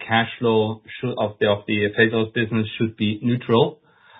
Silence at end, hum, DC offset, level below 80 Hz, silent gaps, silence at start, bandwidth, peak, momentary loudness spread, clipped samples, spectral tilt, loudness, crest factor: 0.45 s; none; under 0.1%; -56 dBFS; none; 0 s; 4 kHz; -2 dBFS; 7 LU; under 0.1%; -11 dB/octave; -21 LUFS; 20 dB